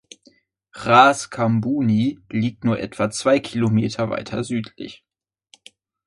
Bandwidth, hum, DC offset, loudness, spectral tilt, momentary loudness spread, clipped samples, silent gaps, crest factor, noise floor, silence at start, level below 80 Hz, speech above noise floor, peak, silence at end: 11.5 kHz; none; under 0.1%; -20 LUFS; -6 dB/octave; 14 LU; under 0.1%; none; 20 dB; -57 dBFS; 0.75 s; -56 dBFS; 38 dB; 0 dBFS; 1.1 s